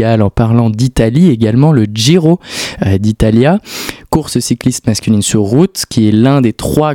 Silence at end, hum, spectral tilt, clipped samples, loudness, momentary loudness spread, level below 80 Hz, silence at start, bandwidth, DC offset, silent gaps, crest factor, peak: 0 s; none; -6 dB/octave; 0.9%; -11 LUFS; 6 LU; -30 dBFS; 0 s; 17 kHz; under 0.1%; none; 10 dB; 0 dBFS